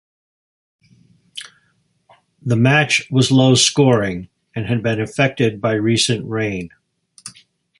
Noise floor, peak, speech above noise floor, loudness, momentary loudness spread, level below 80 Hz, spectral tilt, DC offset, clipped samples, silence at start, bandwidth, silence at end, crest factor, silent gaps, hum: -63 dBFS; 0 dBFS; 47 dB; -16 LUFS; 22 LU; -52 dBFS; -4.5 dB/octave; under 0.1%; under 0.1%; 1.35 s; 11.5 kHz; 0.5 s; 18 dB; none; none